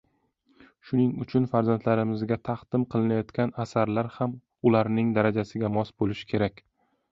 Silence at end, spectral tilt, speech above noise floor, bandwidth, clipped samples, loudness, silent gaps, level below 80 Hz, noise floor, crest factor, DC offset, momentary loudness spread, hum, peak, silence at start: 0.6 s; -8.5 dB/octave; 43 dB; 7.6 kHz; under 0.1%; -27 LUFS; none; -58 dBFS; -68 dBFS; 18 dB; under 0.1%; 6 LU; none; -8 dBFS; 0.85 s